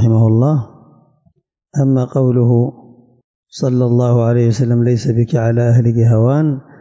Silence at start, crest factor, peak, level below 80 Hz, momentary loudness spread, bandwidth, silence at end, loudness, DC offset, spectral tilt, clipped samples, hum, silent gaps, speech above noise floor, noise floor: 0 s; 10 dB; -4 dBFS; -46 dBFS; 8 LU; 7.8 kHz; 0.2 s; -14 LUFS; under 0.1%; -9 dB/octave; under 0.1%; none; 3.24-3.43 s; 45 dB; -58 dBFS